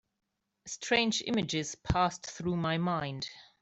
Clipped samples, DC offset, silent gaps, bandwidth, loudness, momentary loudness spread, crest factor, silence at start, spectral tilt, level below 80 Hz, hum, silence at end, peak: under 0.1%; under 0.1%; none; 8.4 kHz; -32 LUFS; 13 LU; 20 dB; 0.65 s; -4 dB/octave; -52 dBFS; none; 0.15 s; -12 dBFS